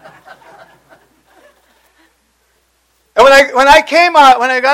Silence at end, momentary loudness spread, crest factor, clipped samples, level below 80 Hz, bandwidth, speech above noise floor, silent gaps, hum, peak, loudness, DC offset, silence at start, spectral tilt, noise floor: 0 s; 4 LU; 12 dB; 1%; -42 dBFS; 16.5 kHz; 50 dB; none; none; 0 dBFS; -7 LUFS; under 0.1%; 3.15 s; -1.5 dB/octave; -58 dBFS